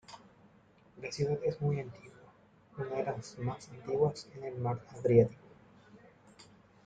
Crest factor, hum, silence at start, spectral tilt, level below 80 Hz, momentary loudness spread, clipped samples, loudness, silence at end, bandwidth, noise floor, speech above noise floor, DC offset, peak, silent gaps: 24 dB; none; 0.1 s; -7.5 dB/octave; -66 dBFS; 20 LU; under 0.1%; -34 LUFS; 0.45 s; 9.2 kHz; -63 dBFS; 30 dB; under 0.1%; -12 dBFS; none